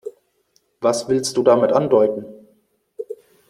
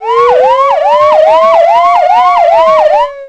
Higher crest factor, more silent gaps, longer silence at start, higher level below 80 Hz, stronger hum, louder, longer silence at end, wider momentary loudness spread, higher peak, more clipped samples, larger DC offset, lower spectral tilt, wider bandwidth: first, 18 dB vs 6 dB; neither; about the same, 0.05 s vs 0 s; second, -62 dBFS vs -46 dBFS; neither; second, -18 LUFS vs -6 LUFS; first, 0.35 s vs 0 s; first, 20 LU vs 2 LU; about the same, -2 dBFS vs 0 dBFS; second, under 0.1% vs 0.5%; second, under 0.1% vs 0.4%; first, -5 dB/octave vs -3 dB/octave; first, 15 kHz vs 9 kHz